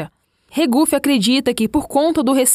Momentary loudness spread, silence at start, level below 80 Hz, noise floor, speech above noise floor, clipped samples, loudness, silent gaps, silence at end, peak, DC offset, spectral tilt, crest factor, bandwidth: 5 LU; 0 s; -46 dBFS; -43 dBFS; 27 dB; under 0.1%; -16 LUFS; none; 0 s; -2 dBFS; under 0.1%; -3 dB/octave; 14 dB; 16 kHz